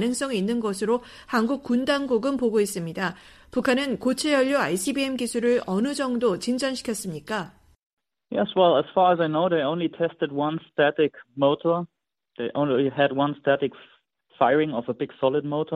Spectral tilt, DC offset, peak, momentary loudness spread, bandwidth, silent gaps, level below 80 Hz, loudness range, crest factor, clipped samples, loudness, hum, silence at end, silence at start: -5 dB/octave; under 0.1%; -6 dBFS; 9 LU; 15 kHz; 7.86-7.97 s; -62 dBFS; 2 LU; 18 dB; under 0.1%; -24 LUFS; none; 0 s; 0 s